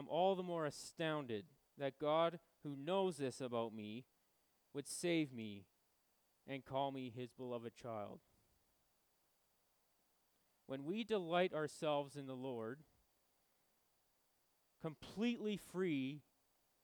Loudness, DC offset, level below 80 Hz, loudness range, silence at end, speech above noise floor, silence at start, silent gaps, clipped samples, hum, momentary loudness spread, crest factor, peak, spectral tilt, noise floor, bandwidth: -43 LUFS; under 0.1%; -84 dBFS; 11 LU; 0.6 s; 38 dB; 0 s; none; under 0.1%; none; 13 LU; 20 dB; -24 dBFS; -5.5 dB/octave; -81 dBFS; over 20 kHz